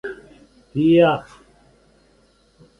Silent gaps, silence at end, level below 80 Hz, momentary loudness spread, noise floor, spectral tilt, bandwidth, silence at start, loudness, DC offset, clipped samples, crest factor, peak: none; 1.6 s; -56 dBFS; 21 LU; -57 dBFS; -8 dB/octave; 6.2 kHz; 0.05 s; -18 LUFS; under 0.1%; under 0.1%; 18 dB; -4 dBFS